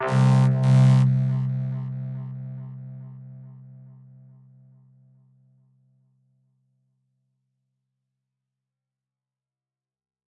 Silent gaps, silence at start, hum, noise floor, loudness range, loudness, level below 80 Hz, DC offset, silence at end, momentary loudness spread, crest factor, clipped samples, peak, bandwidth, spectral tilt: none; 0 s; none; under -90 dBFS; 25 LU; -21 LUFS; -66 dBFS; under 0.1%; 6.75 s; 25 LU; 18 dB; under 0.1%; -8 dBFS; 8.8 kHz; -8.5 dB/octave